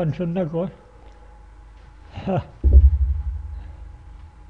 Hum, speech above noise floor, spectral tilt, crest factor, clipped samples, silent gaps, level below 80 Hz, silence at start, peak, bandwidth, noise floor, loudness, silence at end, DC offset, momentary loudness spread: none; 20 dB; -10.5 dB/octave; 20 dB; under 0.1%; none; -22 dBFS; 0 s; -2 dBFS; 3.9 kHz; -45 dBFS; -21 LUFS; 0.1 s; under 0.1%; 25 LU